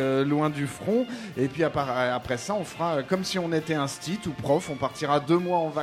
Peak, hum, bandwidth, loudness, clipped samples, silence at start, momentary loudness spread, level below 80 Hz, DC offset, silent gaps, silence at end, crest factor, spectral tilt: -10 dBFS; none; 16 kHz; -27 LUFS; under 0.1%; 0 s; 7 LU; -58 dBFS; under 0.1%; none; 0 s; 18 dB; -5.5 dB/octave